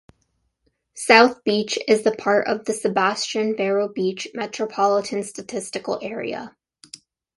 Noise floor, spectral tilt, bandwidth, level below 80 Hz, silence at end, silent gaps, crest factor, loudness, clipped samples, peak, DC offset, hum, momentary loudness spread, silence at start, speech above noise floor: -70 dBFS; -3.5 dB/octave; 11.5 kHz; -66 dBFS; 0.9 s; none; 22 dB; -21 LUFS; under 0.1%; 0 dBFS; under 0.1%; none; 14 LU; 0.95 s; 49 dB